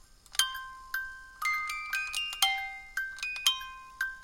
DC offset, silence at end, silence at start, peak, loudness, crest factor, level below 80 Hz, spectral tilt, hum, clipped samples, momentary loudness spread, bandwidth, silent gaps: under 0.1%; 0 s; 0.1 s; -6 dBFS; -31 LUFS; 28 dB; -60 dBFS; 3.5 dB/octave; none; under 0.1%; 9 LU; 17 kHz; none